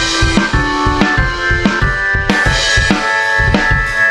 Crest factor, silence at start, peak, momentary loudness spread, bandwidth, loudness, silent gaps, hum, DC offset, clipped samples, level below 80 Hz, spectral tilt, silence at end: 12 dB; 0 s; 0 dBFS; 3 LU; 12.5 kHz; -12 LUFS; none; none; under 0.1%; under 0.1%; -20 dBFS; -4 dB/octave; 0 s